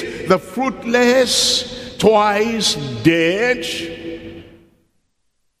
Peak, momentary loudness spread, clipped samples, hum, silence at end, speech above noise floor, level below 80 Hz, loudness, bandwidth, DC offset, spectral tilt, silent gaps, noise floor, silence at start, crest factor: 0 dBFS; 15 LU; under 0.1%; none; 1.1 s; 52 dB; -50 dBFS; -16 LUFS; 15.5 kHz; under 0.1%; -3.5 dB/octave; none; -68 dBFS; 0 s; 18 dB